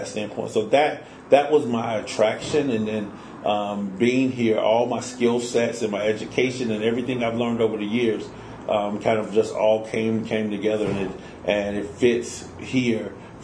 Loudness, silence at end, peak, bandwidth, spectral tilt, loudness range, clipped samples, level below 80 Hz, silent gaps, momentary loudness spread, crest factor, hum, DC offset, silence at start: -23 LUFS; 0 s; -2 dBFS; 10.5 kHz; -5.5 dB/octave; 2 LU; under 0.1%; -56 dBFS; none; 9 LU; 22 dB; none; under 0.1%; 0 s